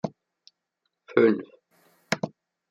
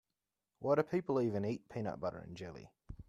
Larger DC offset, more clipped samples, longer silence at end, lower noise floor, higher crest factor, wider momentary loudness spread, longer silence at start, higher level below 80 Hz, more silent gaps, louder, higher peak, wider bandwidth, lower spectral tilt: neither; neither; first, 0.4 s vs 0.05 s; second, -80 dBFS vs under -90 dBFS; about the same, 24 dB vs 20 dB; about the same, 15 LU vs 16 LU; second, 0.05 s vs 0.6 s; second, -76 dBFS vs -64 dBFS; neither; first, -26 LUFS vs -37 LUFS; first, -6 dBFS vs -18 dBFS; about the same, 12.5 kHz vs 12.5 kHz; second, -6 dB/octave vs -8 dB/octave